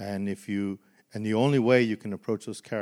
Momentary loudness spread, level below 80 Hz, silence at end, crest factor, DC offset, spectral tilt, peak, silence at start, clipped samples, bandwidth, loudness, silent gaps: 13 LU; -78 dBFS; 0 s; 20 dB; under 0.1%; -6.5 dB/octave; -8 dBFS; 0 s; under 0.1%; 13.5 kHz; -27 LUFS; none